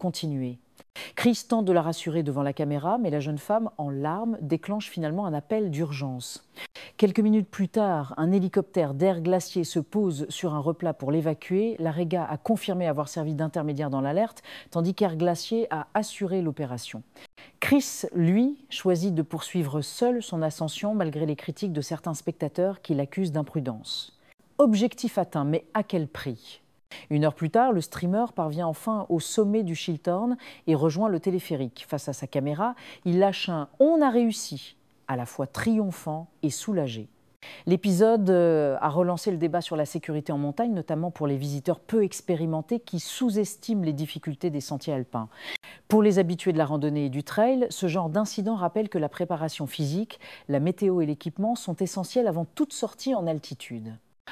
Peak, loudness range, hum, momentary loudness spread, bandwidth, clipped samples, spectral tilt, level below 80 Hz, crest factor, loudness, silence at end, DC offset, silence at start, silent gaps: -6 dBFS; 4 LU; none; 10 LU; 15.5 kHz; under 0.1%; -6 dB/octave; -68 dBFS; 20 dB; -27 LUFS; 0 s; under 0.1%; 0 s; 24.34-24.38 s, 37.36-37.40 s, 54.20-54.25 s